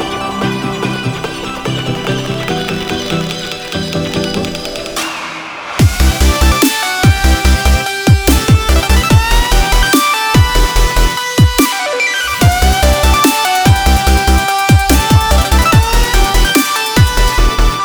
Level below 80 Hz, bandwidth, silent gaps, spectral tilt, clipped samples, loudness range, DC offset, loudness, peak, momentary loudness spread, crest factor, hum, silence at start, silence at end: -14 dBFS; over 20 kHz; none; -4 dB/octave; under 0.1%; 7 LU; under 0.1%; -12 LUFS; 0 dBFS; 9 LU; 10 dB; none; 0 s; 0 s